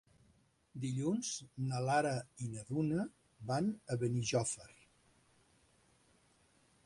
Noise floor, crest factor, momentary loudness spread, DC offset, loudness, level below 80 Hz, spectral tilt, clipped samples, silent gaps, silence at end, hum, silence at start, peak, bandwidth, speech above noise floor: -72 dBFS; 18 dB; 12 LU; under 0.1%; -38 LUFS; -70 dBFS; -5.5 dB/octave; under 0.1%; none; 2.15 s; none; 0.75 s; -22 dBFS; 11.5 kHz; 35 dB